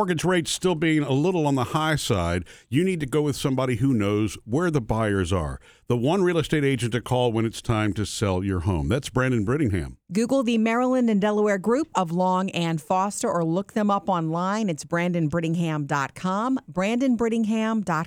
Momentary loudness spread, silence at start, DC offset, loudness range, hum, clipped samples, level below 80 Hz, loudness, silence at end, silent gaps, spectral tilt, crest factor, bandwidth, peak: 5 LU; 0 s; under 0.1%; 2 LU; none; under 0.1%; -46 dBFS; -24 LUFS; 0 s; none; -6 dB/octave; 16 dB; 18.5 kHz; -8 dBFS